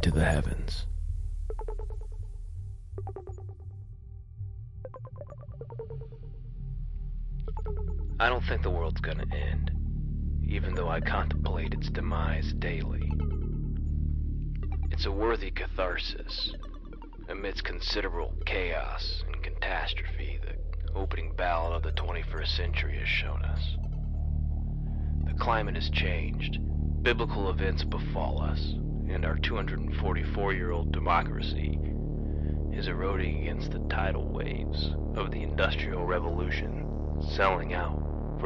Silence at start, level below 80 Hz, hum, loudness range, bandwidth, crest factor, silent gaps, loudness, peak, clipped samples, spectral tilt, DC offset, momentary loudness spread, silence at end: 0 s; -32 dBFS; none; 11 LU; 11 kHz; 20 dB; none; -32 LUFS; -10 dBFS; under 0.1%; -7 dB/octave; under 0.1%; 13 LU; 0 s